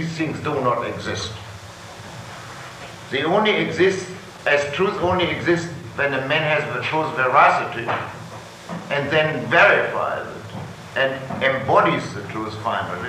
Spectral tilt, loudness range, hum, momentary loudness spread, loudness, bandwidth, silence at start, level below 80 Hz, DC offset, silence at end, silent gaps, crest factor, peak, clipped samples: -5 dB/octave; 5 LU; none; 20 LU; -20 LUFS; 15.5 kHz; 0 s; -50 dBFS; under 0.1%; 0 s; none; 18 dB; -2 dBFS; under 0.1%